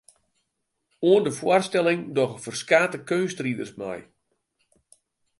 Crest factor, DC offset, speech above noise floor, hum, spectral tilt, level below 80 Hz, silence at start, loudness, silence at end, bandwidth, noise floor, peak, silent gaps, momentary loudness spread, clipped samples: 22 dB; under 0.1%; 55 dB; none; -5 dB/octave; -70 dBFS; 1 s; -23 LUFS; 1.4 s; 11.5 kHz; -78 dBFS; -4 dBFS; none; 13 LU; under 0.1%